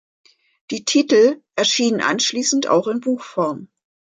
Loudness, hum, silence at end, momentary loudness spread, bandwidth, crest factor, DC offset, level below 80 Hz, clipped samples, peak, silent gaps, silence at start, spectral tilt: -18 LUFS; none; 0.5 s; 9 LU; 9.6 kHz; 16 dB; under 0.1%; -72 dBFS; under 0.1%; -4 dBFS; none; 0.7 s; -2.5 dB/octave